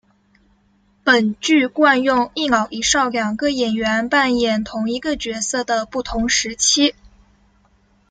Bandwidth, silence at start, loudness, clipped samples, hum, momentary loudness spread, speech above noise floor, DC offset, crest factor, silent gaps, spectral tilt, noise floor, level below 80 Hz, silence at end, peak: 10 kHz; 1.05 s; -18 LUFS; under 0.1%; none; 8 LU; 40 dB; under 0.1%; 18 dB; none; -2 dB/octave; -58 dBFS; -46 dBFS; 1.2 s; -2 dBFS